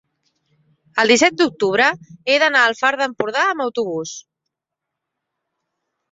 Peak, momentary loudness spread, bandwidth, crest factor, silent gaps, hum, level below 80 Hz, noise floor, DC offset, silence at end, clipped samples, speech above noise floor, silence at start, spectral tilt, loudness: -2 dBFS; 13 LU; 8 kHz; 18 dB; none; none; -66 dBFS; -82 dBFS; under 0.1%; 1.9 s; under 0.1%; 65 dB; 0.95 s; -2.5 dB/octave; -17 LUFS